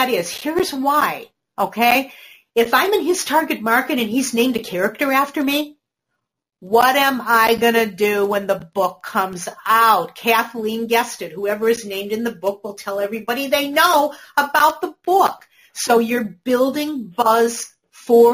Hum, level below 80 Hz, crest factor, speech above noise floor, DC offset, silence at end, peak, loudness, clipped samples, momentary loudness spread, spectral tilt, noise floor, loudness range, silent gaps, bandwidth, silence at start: none; -60 dBFS; 16 dB; 60 dB; under 0.1%; 0 s; -2 dBFS; -18 LUFS; under 0.1%; 10 LU; -3 dB/octave; -78 dBFS; 3 LU; none; 15.5 kHz; 0 s